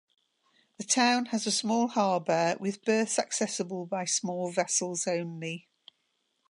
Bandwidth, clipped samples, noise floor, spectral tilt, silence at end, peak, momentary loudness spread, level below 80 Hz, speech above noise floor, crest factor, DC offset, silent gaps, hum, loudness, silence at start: 11.5 kHz; under 0.1%; -77 dBFS; -3 dB/octave; 0.9 s; -10 dBFS; 9 LU; -84 dBFS; 48 dB; 20 dB; under 0.1%; none; none; -29 LUFS; 0.8 s